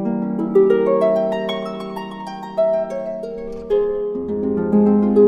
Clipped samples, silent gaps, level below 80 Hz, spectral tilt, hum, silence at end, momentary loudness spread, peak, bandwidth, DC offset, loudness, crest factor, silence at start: under 0.1%; none; -48 dBFS; -8.5 dB/octave; none; 0 s; 14 LU; -2 dBFS; 7 kHz; under 0.1%; -19 LUFS; 16 dB; 0 s